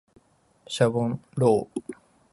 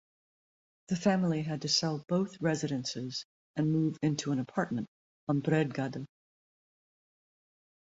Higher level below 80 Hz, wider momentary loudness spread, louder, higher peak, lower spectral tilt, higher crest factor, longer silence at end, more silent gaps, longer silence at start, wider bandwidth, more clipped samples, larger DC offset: first, -62 dBFS vs -70 dBFS; first, 14 LU vs 11 LU; first, -25 LUFS vs -32 LUFS; first, -8 dBFS vs -14 dBFS; about the same, -6.5 dB/octave vs -5.5 dB/octave; about the same, 20 dB vs 20 dB; second, 0.4 s vs 1.85 s; second, none vs 3.25-3.54 s, 4.88-5.27 s; second, 0.7 s vs 0.9 s; first, 11.5 kHz vs 8 kHz; neither; neither